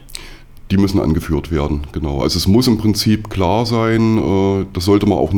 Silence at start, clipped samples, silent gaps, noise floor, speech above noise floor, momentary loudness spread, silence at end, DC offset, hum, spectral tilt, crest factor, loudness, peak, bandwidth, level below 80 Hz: 0.05 s; under 0.1%; none; -35 dBFS; 20 dB; 7 LU; 0 s; under 0.1%; none; -6 dB/octave; 14 dB; -16 LUFS; -2 dBFS; 19 kHz; -30 dBFS